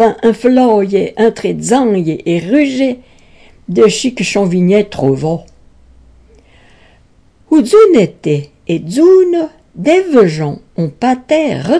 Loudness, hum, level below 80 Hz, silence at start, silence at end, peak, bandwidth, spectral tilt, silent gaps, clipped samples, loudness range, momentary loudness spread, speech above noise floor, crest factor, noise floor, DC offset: -12 LUFS; none; -46 dBFS; 0 s; 0 s; 0 dBFS; 11 kHz; -6 dB/octave; none; under 0.1%; 5 LU; 11 LU; 37 dB; 12 dB; -48 dBFS; 0.1%